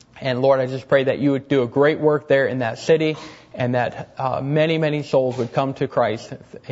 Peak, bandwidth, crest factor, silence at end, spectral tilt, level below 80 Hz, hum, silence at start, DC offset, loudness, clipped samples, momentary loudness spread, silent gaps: -4 dBFS; 8 kHz; 16 dB; 0 s; -7 dB/octave; -60 dBFS; none; 0.15 s; under 0.1%; -20 LUFS; under 0.1%; 9 LU; none